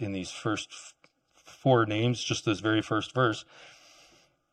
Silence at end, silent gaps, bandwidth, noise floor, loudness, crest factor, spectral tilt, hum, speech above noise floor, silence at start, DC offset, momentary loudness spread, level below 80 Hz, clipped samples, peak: 0.8 s; none; 10.5 kHz; -65 dBFS; -28 LUFS; 20 dB; -5 dB/octave; none; 36 dB; 0 s; under 0.1%; 14 LU; -66 dBFS; under 0.1%; -10 dBFS